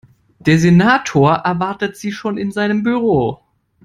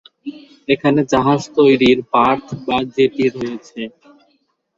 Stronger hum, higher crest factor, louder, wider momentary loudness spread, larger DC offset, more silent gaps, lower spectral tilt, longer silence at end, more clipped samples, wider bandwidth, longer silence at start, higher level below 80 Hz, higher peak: neither; about the same, 14 dB vs 16 dB; about the same, -15 LUFS vs -16 LUFS; second, 11 LU vs 18 LU; neither; neither; about the same, -6.5 dB/octave vs -6 dB/octave; second, 0.5 s vs 0.9 s; neither; first, 12.5 kHz vs 7.8 kHz; first, 0.45 s vs 0.25 s; about the same, -48 dBFS vs -52 dBFS; about the same, 0 dBFS vs -2 dBFS